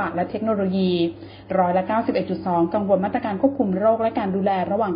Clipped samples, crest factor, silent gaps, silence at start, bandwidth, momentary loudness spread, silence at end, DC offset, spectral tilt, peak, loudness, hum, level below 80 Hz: under 0.1%; 16 dB; none; 0 s; 5.2 kHz; 5 LU; 0 s; under 0.1%; -12 dB/octave; -6 dBFS; -22 LUFS; none; -54 dBFS